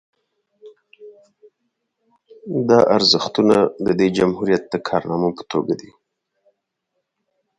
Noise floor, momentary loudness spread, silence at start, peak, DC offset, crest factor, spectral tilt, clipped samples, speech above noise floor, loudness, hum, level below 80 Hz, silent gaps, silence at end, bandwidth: -76 dBFS; 10 LU; 0.65 s; 0 dBFS; under 0.1%; 20 dB; -5.5 dB/octave; under 0.1%; 58 dB; -18 LUFS; none; -56 dBFS; none; 1.75 s; 11 kHz